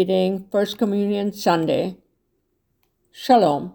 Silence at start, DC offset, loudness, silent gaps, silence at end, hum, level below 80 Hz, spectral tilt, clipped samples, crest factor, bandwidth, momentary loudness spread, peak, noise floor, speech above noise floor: 0 s; under 0.1%; -20 LUFS; none; 0.05 s; none; -62 dBFS; -6 dB/octave; under 0.1%; 18 dB; over 20 kHz; 7 LU; -4 dBFS; -70 dBFS; 50 dB